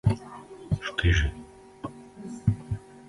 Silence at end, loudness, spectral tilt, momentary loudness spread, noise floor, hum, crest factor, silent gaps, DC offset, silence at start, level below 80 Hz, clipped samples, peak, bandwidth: 0.1 s; -28 LUFS; -6 dB/octave; 20 LU; -44 dBFS; none; 20 dB; none; under 0.1%; 0.05 s; -36 dBFS; under 0.1%; -10 dBFS; 11.5 kHz